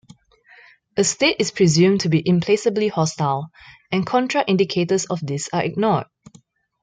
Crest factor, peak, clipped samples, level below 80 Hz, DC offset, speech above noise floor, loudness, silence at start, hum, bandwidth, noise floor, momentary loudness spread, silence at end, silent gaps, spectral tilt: 16 dB; -4 dBFS; under 0.1%; -58 dBFS; under 0.1%; 34 dB; -20 LUFS; 0.95 s; none; 9.6 kHz; -53 dBFS; 9 LU; 0.8 s; none; -5 dB/octave